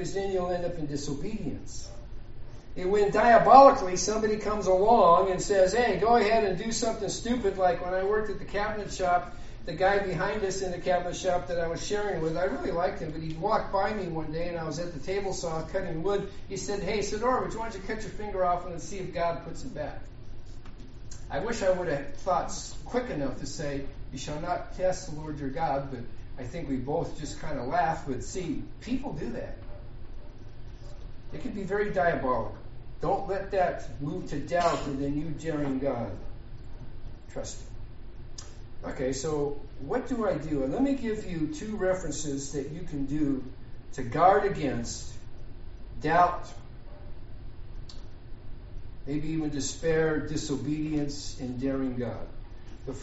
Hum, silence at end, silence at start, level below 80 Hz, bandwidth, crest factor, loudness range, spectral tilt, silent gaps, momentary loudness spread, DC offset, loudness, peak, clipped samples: none; 0 s; 0 s; -42 dBFS; 8 kHz; 26 dB; 12 LU; -4.5 dB/octave; none; 23 LU; under 0.1%; -28 LUFS; -2 dBFS; under 0.1%